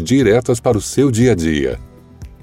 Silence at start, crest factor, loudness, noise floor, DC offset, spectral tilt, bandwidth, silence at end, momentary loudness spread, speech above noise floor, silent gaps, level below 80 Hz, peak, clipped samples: 0 s; 14 dB; -15 LUFS; -37 dBFS; under 0.1%; -6 dB/octave; 16 kHz; 0.1 s; 8 LU; 23 dB; none; -34 dBFS; -2 dBFS; under 0.1%